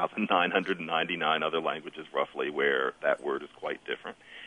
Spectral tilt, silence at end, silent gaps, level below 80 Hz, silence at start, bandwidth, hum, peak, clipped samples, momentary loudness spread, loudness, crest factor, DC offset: -5.5 dB/octave; 0 s; none; -76 dBFS; 0 s; 10 kHz; none; -10 dBFS; under 0.1%; 11 LU; -30 LUFS; 20 dB; under 0.1%